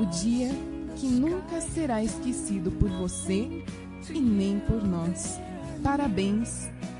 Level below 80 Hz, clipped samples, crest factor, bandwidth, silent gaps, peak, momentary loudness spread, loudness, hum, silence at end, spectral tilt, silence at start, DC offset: -42 dBFS; under 0.1%; 20 dB; 11.5 kHz; none; -8 dBFS; 9 LU; -29 LUFS; none; 0 s; -5.5 dB/octave; 0 s; under 0.1%